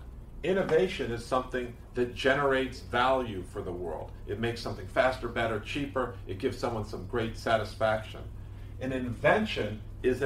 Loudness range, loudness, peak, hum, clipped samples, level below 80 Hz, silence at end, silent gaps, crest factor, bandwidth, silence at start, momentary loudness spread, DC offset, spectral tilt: 4 LU; -31 LUFS; -10 dBFS; none; under 0.1%; -46 dBFS; 0 s; none; 20 dB; 15.5 kHz; 0 s; 12 LU; under 0.1%; -6 dB/octave